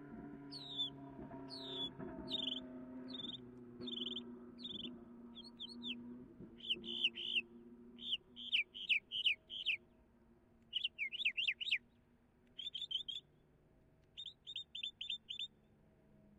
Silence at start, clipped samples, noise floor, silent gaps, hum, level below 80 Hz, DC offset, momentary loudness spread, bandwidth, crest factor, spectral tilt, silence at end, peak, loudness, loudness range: 0 s; under 0.1%; -71 dBFS; none; none; -74 dBFS; under 0.1%; 17 LU; 14.5 kHz; 22 dB; -3 dB/octave; 0.05 s; -24 dBFS; -41 LUFS; 9 LU